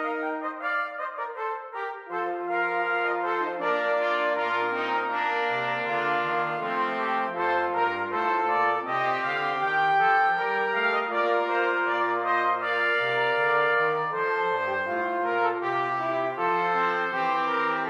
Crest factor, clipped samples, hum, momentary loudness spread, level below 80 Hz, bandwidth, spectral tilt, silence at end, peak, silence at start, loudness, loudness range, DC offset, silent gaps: 14 dB; under 0.1%; none; 6 LU; -80 dBFS; 9.4 kHz; -5 dB/octave; 0 s; -12 dBFS; 0 s; -25 LUFS; 3 LU; under 0.1%; none